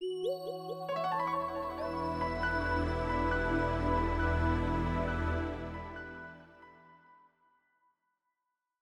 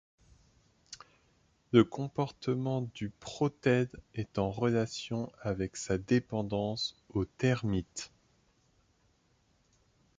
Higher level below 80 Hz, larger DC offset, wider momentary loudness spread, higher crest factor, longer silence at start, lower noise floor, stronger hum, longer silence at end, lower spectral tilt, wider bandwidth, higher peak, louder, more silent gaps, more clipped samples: first, -42 dBFS vs -58 dBFS; neither; about the same, 11 LU vs 13 LU; second, 16 dB vs 26 dB; second, 0 s vs 0.9 s; first, -86 dBFS vs -71 dBFS; neither; second, 1.85 s vs 2.1 s; first, -7.5 dB/octave vs -6 dB/octave; first, 14 kHz vs 9.4 kHz; second, -18 dBFS vs -8 dBFS; about the same, -34 LUFS vs -33 LUFS; neither; neither